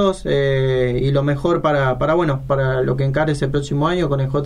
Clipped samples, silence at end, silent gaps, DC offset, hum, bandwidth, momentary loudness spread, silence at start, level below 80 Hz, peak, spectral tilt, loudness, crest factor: under 0.1%; 0 s; none; under 0.1%; none; 10.5 kHz; 2 LU; 0 s; -34 dBFS; -4 dBFS; -7.5 dB/octave; -18 LUFS; 14 dB